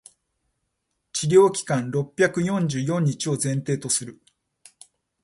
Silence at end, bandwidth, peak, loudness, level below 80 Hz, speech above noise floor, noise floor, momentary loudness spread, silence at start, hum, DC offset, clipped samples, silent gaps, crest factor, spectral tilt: 1.1 s; 12 kHz; -4 dBFS; -22 LUFS; -64 dBFS; 55 dB; -77 dBFS; 10 LU; 1.15 s; none; under 0.1%; under 0.1%; none; 20 dB; -5 dB/octave